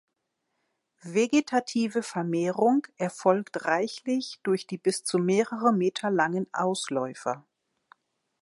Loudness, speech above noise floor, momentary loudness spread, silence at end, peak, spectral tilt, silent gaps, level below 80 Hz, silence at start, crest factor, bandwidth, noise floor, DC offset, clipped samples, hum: -27 LUFS; 54 dB; 6 LU; 1 s; -8 dBFS; -5 dB/octave; none; -80 dBFS; 1.05 s; 20 dB; 11.5 kHz; -80 dBFS; under 0.1%; under 0.1%; none